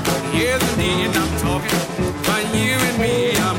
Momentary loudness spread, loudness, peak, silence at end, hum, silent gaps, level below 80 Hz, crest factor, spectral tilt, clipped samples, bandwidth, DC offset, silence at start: 3 LU; -19 LUFS; -4 dBFS; 0 s; none; none; -34 dBFS; 16 dB; -4 dB/octave; under 0.1%; 16.5 kHz; under 0.1%; 0 s